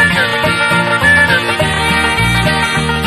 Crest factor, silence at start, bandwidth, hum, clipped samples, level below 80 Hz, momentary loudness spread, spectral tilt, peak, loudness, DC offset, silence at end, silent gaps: 12 dB; 0 s; 14.5 kHz; none; under 0.1%; -28 dBFS; 4 LU; -4 dB/octave; 0 dBFS; -11 LUFS; under 0.1%; 0 s; none